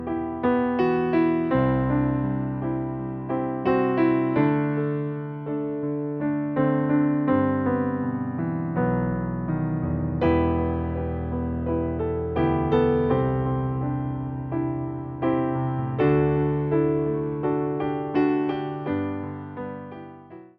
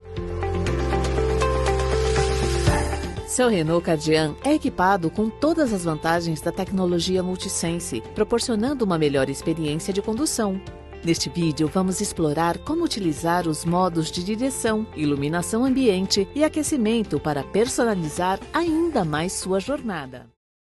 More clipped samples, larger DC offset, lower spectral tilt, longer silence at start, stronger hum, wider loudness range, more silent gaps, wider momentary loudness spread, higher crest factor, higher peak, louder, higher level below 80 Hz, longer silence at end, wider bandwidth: neither; neither; first, -8 dB/octave vs -5 dB/octave; about the same, 0 s vs 0 s; neither; about the same, 2 LU vs 2 LU; neither; about the same, 8 LU vs 6 LU; about the same, 16 dB vs 16 dB; about the same, -8 dBFS vs -6 dBFS; about the same, -25 LUFS vs -23 LUFS; second, -42 dBFS vs -36 dBFS; second, 0.1 s vs 0.4 s; second, 5.2 kHz vs 12.5 kHz